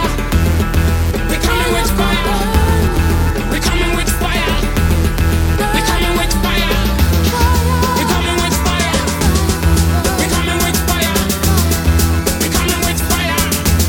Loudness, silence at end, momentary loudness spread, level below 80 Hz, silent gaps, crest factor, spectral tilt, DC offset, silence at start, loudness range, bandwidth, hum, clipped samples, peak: -14 LUFS; 0 s; 2 LU; -18 dBFS; none; 12 dB; -4.5 dB/octave; under 0.1%; 0 s; 1 LU; 17 kHz; none; under 0.1%; 0 dBFS